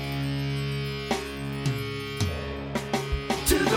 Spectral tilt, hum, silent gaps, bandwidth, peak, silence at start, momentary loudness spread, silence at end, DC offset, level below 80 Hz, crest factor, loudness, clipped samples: -4.5 dB/octave; none; none; 17.5 kHz; -8 dBFS; 0 s; 6 LU; 0 s; under 0.1%; -40 dBFS; 20 dB; -29 LUFS; under 0.1%